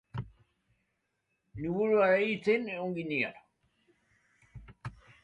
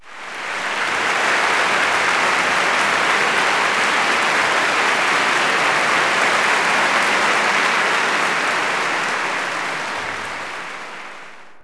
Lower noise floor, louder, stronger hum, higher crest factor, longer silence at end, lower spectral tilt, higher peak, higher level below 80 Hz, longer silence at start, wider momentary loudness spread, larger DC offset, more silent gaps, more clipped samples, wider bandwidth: first, -80 dBFS vs -40 dBFS; second, -30 LUFS vs -17 LUFS; neither; about the same, 18 dB vs 16 dB; first, 0.3 s vs 0 s; first, -7.5 dB/octave vs -1 dB/octave; second, -14 dBFS vs -4 dBFS; about the same, -62 dBFS vs -60 dBFS; first, 0.15 s vs 0 s; first, 22 LU vs 11 LU; neither; neither; neither; second, 8.4 kHz vs 11 kHz